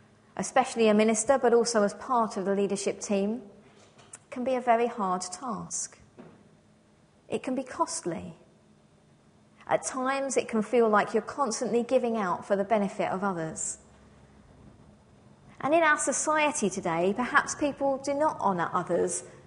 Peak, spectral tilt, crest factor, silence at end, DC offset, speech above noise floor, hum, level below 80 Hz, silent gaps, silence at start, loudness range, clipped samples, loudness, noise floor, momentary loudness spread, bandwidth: -8 dBFS; -4 dB/octave; 22 dB; 0.05 s; under 0.1%; 34 dB; none; -66 dBFS; none; 0.35 s; 9 LU; under 0.1%; -27 LUFS; -61 dBFS; 11 LU; 10.5 kHz